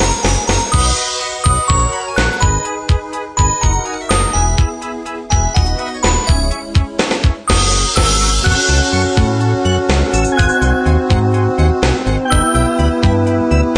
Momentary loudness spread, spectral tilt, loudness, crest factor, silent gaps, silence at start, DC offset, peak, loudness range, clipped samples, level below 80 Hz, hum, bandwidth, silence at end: 5 LU; -4 dB/octave; -14 LUFS; 14 dB; none; 0 s; under 0.1%; 0 dBFS; 3 LU; under 0.1%; -18 dBFS; none; 11 kHz; 0 s